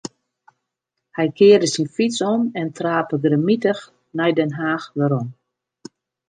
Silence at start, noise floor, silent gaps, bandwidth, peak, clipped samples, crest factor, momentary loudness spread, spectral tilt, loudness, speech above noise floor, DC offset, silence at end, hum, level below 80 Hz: 0.05 s; -80 dBFS; none; 9.6 kHz; -2 dBFS; under 0.1%; 18 dB; 13 LU; -5.5 dB/octave; -19 LUFS; 62 dB; under 0.1%; 0.95 s; none; -70 dBFS